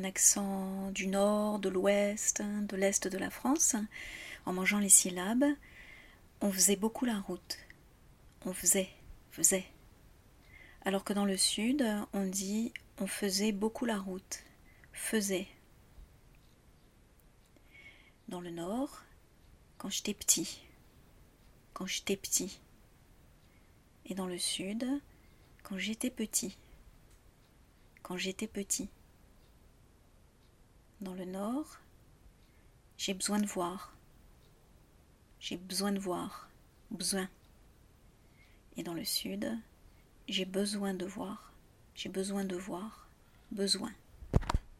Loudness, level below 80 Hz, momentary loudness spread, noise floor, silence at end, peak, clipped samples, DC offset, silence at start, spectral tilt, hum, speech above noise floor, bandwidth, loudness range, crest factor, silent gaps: -33 LUFS; -56 dBFS; 17 LU; -63 dBFS; 0.05 s; -8 dBFS; under 0.1%; under 0.1%; 0 s; -3 dB/octave; none; 29 dB; 16 kHz; 12 LU; 28 dB; none